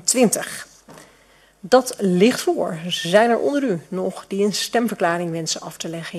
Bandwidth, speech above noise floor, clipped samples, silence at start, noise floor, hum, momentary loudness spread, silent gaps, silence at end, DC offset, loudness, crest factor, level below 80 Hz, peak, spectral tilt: 14.5 kHz; 34 dB; under 0.1%; 0.05 s; -54 dBFS; none; 10 LU; none; 0 s; under 0.1%; -20 LUFS; 20 dB; -64 dBFS; 0 dBFS; -4 dB/octave